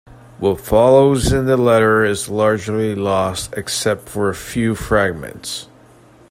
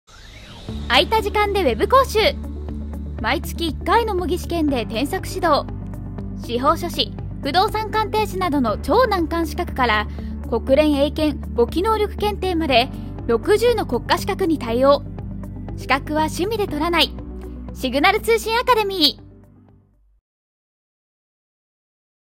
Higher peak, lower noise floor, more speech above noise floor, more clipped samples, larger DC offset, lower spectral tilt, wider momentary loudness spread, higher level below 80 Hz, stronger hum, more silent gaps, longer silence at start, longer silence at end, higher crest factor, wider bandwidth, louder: about the same, 0 dBFS vs 0 dBFS; second, -46 dBFS vs -55 dBFS; second, 30 dB vs 36 dB; neither; neither; about the same, -5 dB/octave vs -5 dB/octave; second, 11 LU vs 14 LU; about the same, -36 dBFS vs -34 dBFS; neither; neither; about the same, 0.1 s vs 0.1 s; second, 0.65 s vs 3 s; about the same, 16 dB vs 20 dB; about the same, 16 kHz vs 16.5 kHz; first, -16 LUFS vs -19 LUFS